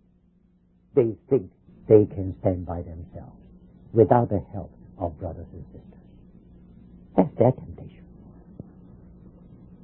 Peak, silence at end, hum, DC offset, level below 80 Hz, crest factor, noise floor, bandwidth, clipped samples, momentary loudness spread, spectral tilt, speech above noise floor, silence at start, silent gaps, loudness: -2 dBFS; 1.95 s; none; under 0.1%; -46 dBFS; 24 dB; -61 dBFS; 3.3 kHz; under 0.1%; 27 LU; -13.5 dB/octave; 38 dB; 0.95 s; none; -24 LUFS